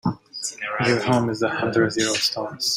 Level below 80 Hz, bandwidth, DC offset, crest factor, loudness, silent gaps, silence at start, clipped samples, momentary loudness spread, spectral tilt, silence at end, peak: -58 dBFS; 16 kHz; under 0.1%; 16 dB; -22 LUFS; none; 0.05 s; under 0.1%; 8 LU; -4 dB/octave; 0 s; -6 dBFS